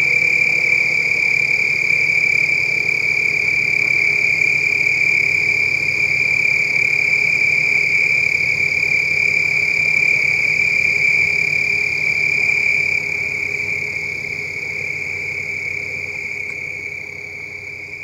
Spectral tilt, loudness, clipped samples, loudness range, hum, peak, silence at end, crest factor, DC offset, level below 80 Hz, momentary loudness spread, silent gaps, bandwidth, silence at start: -2 dB/octave; -14 LUFS; under 0.1%; 8 LU; none; -4 dBFS; 0 s; 12 dB; under 0.1%; -52 dBFS; 10 LU; none; 16 kHz; 0 s